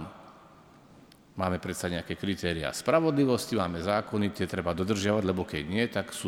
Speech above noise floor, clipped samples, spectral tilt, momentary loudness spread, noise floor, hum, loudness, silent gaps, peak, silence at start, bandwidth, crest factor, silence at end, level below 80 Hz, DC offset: 26 dB; under 0.1%; -5.5 dB/octave; 8 LU; -55 dBFS; none; -29 LUFS; none; -10 dBFS; 0 s; 18.5 kHz; 20 dB; 0 s; -54 dBFS; under 0.1%